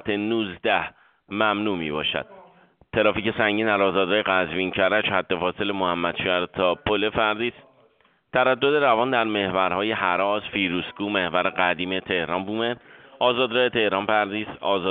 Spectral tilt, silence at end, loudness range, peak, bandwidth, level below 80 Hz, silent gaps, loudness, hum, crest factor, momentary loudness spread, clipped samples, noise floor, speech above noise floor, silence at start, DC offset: -2 dB/octave; 0 s; 2 LU; -4 dBFS; 4.7 kHz; -56 dBFS; none; -23 LUFS; none; 20 dB; 6 LU; under 0.1%; -61 dBFS; 39 dB; 0.05 s; under 0.1%